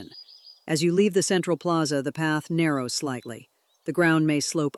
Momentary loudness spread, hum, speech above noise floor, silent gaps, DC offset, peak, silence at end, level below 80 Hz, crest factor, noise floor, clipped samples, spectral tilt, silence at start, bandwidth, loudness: 19 LU; none; 25 dB; none; under 0.1%; -10 dBFS; 0.05 s; -72 dBFS; 14 dB; -49 dBFS; under 0.1%; -4.5 dB/octave; 0 s; 14.5 kHz; -24 LUFS